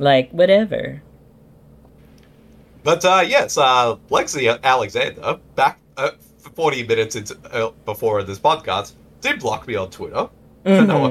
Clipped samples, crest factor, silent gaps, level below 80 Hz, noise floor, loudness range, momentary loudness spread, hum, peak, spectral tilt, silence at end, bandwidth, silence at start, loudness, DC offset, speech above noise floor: under 0.1%; 16 dB; none; -54 dBFS; -48 dBFS; 5 LU; 12 LU; none; -2 dBFS; -4.5 dB/octave; 0 s; 14.5 kHz; 0 s; -19 LUFS; under 0.1%; 30 dB